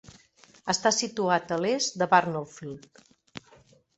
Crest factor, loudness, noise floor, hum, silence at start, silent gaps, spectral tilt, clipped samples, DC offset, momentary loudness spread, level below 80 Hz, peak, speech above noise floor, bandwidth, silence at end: 24 dB; -26 LUFS; -59 dBFS; none; 0.65 s; none; -3 dB/octave; under 0.1%; under 0.1%; 23 LU; -68 dBFS; -6 dBFS; 32 dB; 8.2 kHz; 0.6 s